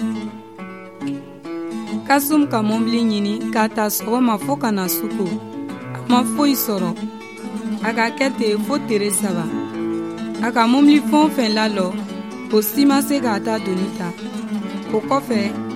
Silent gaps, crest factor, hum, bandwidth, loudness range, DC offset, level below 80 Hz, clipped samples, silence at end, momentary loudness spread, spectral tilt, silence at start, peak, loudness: none; 18 dB; none; 16 kHz; 4 LU; 0.2%; -64 dBFS; under 0.1%; 0 s; 14 LU; -4.5 dB/octave; 0 s; -2 dBFS; -19 LUFS